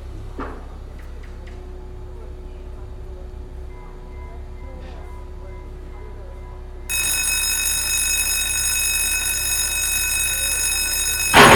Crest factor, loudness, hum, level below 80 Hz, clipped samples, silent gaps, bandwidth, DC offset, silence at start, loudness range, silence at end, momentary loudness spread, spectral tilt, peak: 22 dB; -17 LUFS; none; -34 dBFS; under 0.1%; none; 18 kHz; under 0.1%; 0 s; 20 LU; 0 s; 20 LU; -1.5 dB/octave; 0 dBFS